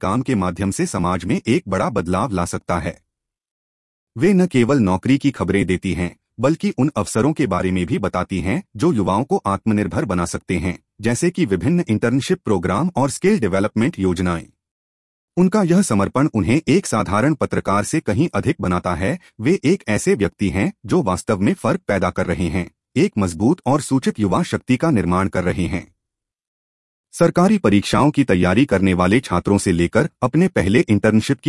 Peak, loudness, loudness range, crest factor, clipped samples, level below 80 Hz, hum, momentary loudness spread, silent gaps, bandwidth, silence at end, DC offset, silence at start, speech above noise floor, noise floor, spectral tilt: -2 dBFS; -19 LUFS; 4 LU; 16 dB; under 0.1%; -46 dBFS; none; 7 LU; 3.51-4.07 s, 14.71-15.28 s, 26.47-27.04 s; 12 kHz; 0 s; 0.1%; 0 s; 65 dB; -83 dBFS; -6.5 dB/octave